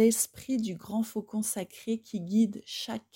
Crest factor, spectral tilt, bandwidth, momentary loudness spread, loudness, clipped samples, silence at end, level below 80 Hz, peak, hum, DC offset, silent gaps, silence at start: 18 dB; -4.5 dB/octave; 16.5 kHz; 8 LU; -31 LUFS; under 0.1%; 0.15 s; -70 dBFS; -12 dBFS; none; under 0.1%; none; 0 s